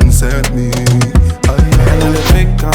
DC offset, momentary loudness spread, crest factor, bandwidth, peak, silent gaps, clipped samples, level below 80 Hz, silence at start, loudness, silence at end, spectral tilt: under 0.1%; 4 LU; 8 dB; 19 kHz; 0 dBFS; none; 0.3%; -12 dBFS; 0 s; -11 LUFS; 0 s; -5.5 dB/octave